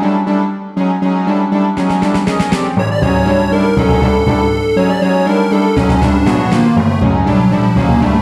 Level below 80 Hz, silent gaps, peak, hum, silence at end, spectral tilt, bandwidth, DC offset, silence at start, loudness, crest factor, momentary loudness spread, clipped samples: -26 dBFS; none; 0 dBFS; none; 0 s; -7.5 dB/octave; 12.5 kHz; under 0.1%; 0 s; -13 LUFS; 12 dB; 3 LU; under 0.1%